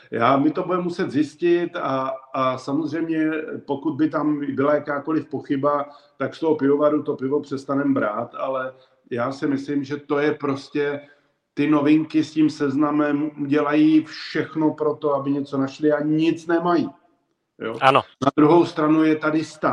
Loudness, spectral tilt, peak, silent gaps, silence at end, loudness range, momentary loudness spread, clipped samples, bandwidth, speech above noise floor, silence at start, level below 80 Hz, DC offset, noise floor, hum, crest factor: -22 LUFS; -7 dB/octave; 0 dBFS; none; 0 s; 4 LU; 9 LU; under 0.1%; 8.8 kHz; 47 dB; 0.1 s; -68 dBFS; under 0.1%; -68 dBFS; none; 20 dB